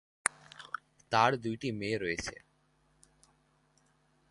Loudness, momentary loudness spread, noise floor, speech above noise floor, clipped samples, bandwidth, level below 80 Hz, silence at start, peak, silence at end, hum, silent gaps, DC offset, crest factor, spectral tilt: -33 LUFS; 16 LU; -71 dBFS; 39 dB; under 0.1%; 11.5 kHz; -64 dBFS; 0.25 s; -6 dBFS; 1.95 s; none; none; under 0.1%; 32 dB; -3.5 dB/octave